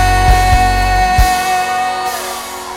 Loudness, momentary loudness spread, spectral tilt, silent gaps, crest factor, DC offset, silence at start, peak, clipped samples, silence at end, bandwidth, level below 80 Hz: -13 LUFS; 9 LU; -3.5 dB/octave; none; 12 dB; under 0.1%; 0 s; 0 dBFS; under 0.1%; 0 s; 17 kHz; -18 dBFS